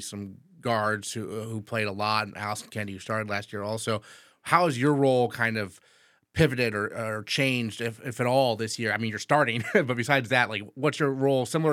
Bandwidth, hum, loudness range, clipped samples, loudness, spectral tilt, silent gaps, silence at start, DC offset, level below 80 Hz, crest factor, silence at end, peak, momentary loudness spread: 16.5 kHz; none; 5 LU; under 0.1%; -27 LUFS; -5 dB/octave; none; 0 s; under 0.1%; -60 dBFS; 22 dB; 0 s; -4 dBFS; 11 LU